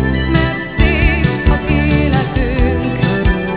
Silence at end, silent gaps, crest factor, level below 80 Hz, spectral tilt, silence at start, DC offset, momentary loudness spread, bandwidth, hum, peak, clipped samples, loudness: 0 s; none; 14 dB; -18 dBFS; -11 dB/octave; 0 s; 0.7%; 3 LU; 4 kHz; none; 0 dBFS; under 0.1%; -14 LUFS